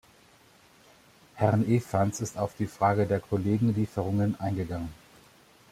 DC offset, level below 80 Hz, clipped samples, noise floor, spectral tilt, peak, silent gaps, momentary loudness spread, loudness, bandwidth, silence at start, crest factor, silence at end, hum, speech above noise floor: under 0.1%; -58 dBFS; under 0.1%; -58 dBFS; -7.5 dB/octave; -8 dBFS; none; 7 LU; -28 LUFS; 15 kHz; 1.35 s; 20 dB; 0.75 s; none; 32 dB